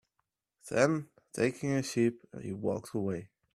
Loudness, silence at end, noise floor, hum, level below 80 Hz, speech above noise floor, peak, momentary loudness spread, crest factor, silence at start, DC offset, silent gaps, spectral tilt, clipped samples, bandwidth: -33 LUFS; 0.3 s; -83 dBFS; none; -70 dBFS; 51 dB; -12 dBFS; 13 LU; 22 dB; 0.65 s; under 0.1%; none; -6 dB/octave; under 0.1%; 14 kHz